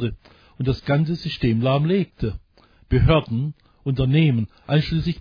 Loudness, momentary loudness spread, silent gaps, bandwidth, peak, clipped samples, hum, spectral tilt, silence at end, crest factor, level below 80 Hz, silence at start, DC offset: -22 LUFS; 11 LU; none; 5.2 kHz; -4 dBFS; under 0.1%; none; -9 dB/octave; 0 s; 18 dB; -34 dBFS; 0 s; under 0.1%